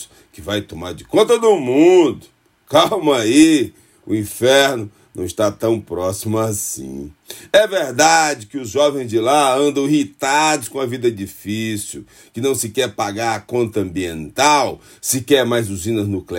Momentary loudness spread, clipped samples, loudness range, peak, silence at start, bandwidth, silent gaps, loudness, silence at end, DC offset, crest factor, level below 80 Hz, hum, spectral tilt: 14 LU; under 0.1%; 6 LU; 0 dBFS; 0 s; 16.5 kHz; none; -17 LUFS; 0 s; under 0.1%; 16 dB; -54 dBFS; none; -4 dB/octave